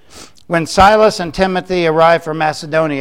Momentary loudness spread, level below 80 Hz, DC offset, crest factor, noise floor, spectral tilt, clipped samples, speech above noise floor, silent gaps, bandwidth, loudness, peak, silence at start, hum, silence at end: 9 LU; -36 dBFS; 0.7%; 14 dB; -39 dBFS; -5 dB/octave; under 0.1%; 27 dB; none; 15.5 kHz; -13 LUFS; 0 dBFS; 0.15 s; none; 0 s